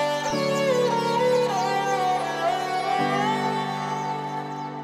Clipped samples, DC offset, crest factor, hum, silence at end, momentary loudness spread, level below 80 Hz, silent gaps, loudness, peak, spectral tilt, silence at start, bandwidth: under 0.1%; under 0.1%; 12 dB; none; 0 s; 7 LU; -68 dBFS; none; -24 LUFS; -12 dBFS; -4.5 dB/octave; 0 s; 15.5 kHz